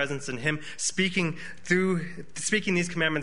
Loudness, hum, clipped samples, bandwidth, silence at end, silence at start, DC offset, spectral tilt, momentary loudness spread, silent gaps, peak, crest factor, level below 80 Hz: -27 LUFS; none; under 0.1%; 11 kHz; 0 s; 0 s; 1%; -4 dB/octave; 7 LU; none; -8 dBFS; 20 dB; -60 dBFS